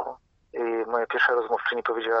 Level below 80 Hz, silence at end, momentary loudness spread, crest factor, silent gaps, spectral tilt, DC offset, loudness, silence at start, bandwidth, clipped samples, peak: -68 dBFS; 0 s; 11 LU; 18 dB; none; 0.5 dB/octave; under 0.1%; -25 LUFS; 0 s; 6.4 kHz; under 0.1%; -8 dBFS